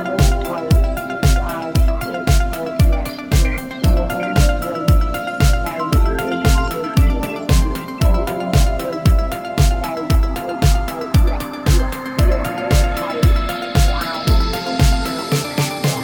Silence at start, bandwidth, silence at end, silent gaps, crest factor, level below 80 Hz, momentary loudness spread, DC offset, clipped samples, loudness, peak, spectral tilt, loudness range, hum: 0 s; 18.5 kHz; 0 s; none; 14 dB; -18 dBFS; 4 LU; under 0.1%; under 0.1%; -18 LUFS; -2 dBFS; -5.5 dB/octave; 1 LU; none